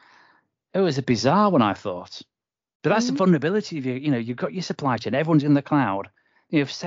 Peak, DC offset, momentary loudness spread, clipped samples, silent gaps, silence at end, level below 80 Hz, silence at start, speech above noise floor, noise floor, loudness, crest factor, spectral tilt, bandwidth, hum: -6 dBFS; under 0.1%; 12 LU; under 0.1%; 2.75-2.80 s; 0 s; -66 dBFS; 0.75 s; 40 dB; -61 dBFS; -22 LUFS; 16 dB; -6.5 dB/octave; 7.6 kHz; none